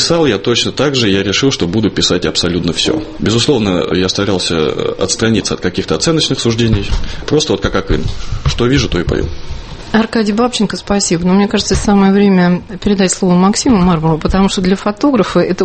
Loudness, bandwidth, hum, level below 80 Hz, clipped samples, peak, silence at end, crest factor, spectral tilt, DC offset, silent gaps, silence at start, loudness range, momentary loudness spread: -13 LUFS; 8.8 kHz; none; -26 dBFS; under 0.1%; 0 dBFS; 0 s; 12 dB; -5 dB/octave; under 0.1%; none; 0 s; 4 LU; 6 LU